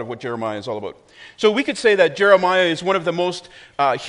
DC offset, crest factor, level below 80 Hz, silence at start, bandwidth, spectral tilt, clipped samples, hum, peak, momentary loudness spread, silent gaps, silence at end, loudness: under 0.1%; 18 dB; -62 dBFS; 0 s; 10.5 kHz; -4.5 dB/octave; under 0.1%; none; 0 dBFS; 15 LU; none; 0 s; -18 LUFS